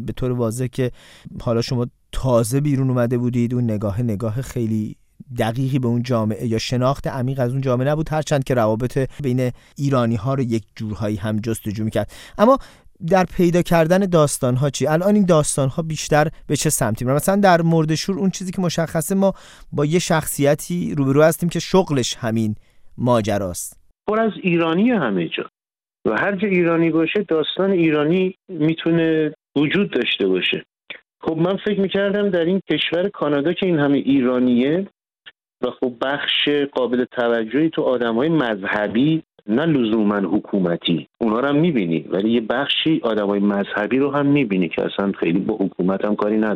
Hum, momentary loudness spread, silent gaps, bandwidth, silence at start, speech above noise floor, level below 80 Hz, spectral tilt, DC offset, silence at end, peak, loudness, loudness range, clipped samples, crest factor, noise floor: none; 8 LU; none; 16 kHz; 0 s; over 71 dB; -44 dBFS; -5.5 dB/octave; under 0.1%; 0 s; -2 dBFS; -19 LUFS; 4 LU; under 0.1%; 18 dB; under -90 dBFS